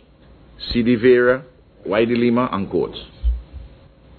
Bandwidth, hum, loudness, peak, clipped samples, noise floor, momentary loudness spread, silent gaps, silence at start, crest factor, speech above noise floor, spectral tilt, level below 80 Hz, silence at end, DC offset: 4.6 kHz; none; -19 LUFS; -2 dBFS; under 0.1%; -48 dBFS; 14 LU; none; 0.6 s; 16 dB; 31 dB; -10 dB/octave; -32 dBFS; 0.5 s; under 0.1%